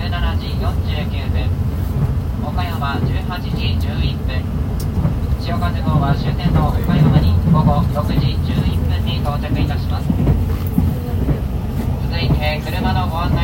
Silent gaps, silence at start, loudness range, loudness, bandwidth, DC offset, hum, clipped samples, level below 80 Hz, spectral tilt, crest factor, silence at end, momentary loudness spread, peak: none; 0 s; 4 LU; -18 LUFS; 16.5 kHz; under 0.1%; none; under 0.1%; -24 dBFS; -7.5 dB/octave; 16 dB; 0 s; 7 LU; 0 dBFS